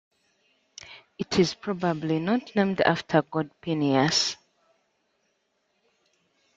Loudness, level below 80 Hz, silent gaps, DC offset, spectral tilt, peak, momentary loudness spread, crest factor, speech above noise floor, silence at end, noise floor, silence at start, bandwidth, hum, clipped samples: -25 LUFS; -64 dBFS; none; under 0.1%; -4.5 dB/octave; -4 dBFS; 20 LU; 24 dB; 49 dB; 2.2 s; -73 dBFS; 0.85 s; 9.4 kHz; none; under 0.1%